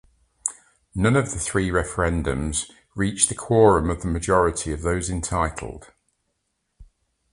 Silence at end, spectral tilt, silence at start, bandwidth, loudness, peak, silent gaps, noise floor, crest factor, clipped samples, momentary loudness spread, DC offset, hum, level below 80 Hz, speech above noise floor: 0.5 s; -5 dB/octave; 0.45 s; 11.5 kHz; -22 LUFS; -2 dBFS; none; -75 dBFS; 22 dB; under 0.1%; 12 LU; under 0.1%; none; -36 dBFS; 53 dB